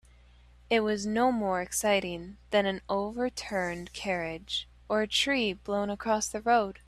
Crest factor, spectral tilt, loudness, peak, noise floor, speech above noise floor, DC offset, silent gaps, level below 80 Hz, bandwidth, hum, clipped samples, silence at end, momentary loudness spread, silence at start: 18 dB; -3.5 dB/octave; -29 LUFS; -12 dBFS; -57 dBFS; 27 dB; under 0.1%; none; -56 dBFS; 14 kHz; none; under 0.1%; 0.1 s; 8 LU; 0.7 s